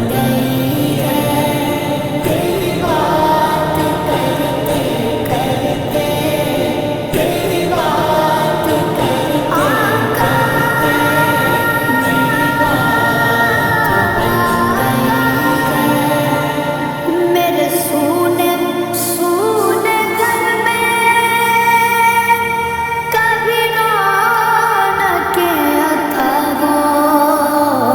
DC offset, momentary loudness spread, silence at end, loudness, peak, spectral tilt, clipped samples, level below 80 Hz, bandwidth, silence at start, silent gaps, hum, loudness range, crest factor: under 0.1%; 5 LU; 0 s; -13 LUFS; 0 dBFS; -4.5 dB/octave; under 0.1%; -40 dBFS; over 20 kHz; 0 s; none; none; 3 LU; 14 dB